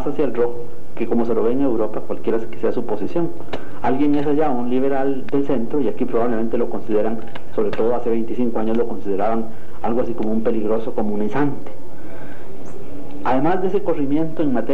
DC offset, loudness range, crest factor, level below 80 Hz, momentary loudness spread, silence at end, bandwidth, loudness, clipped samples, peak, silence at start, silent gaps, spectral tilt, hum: 20%; 3 LU; 14 dB; -50 dBFS; 15 LU; 0 s; 13 kHz; -22 LUFS; under 0.1%; -4 dBFS; 0 s; none; -8.5 dB/octave; none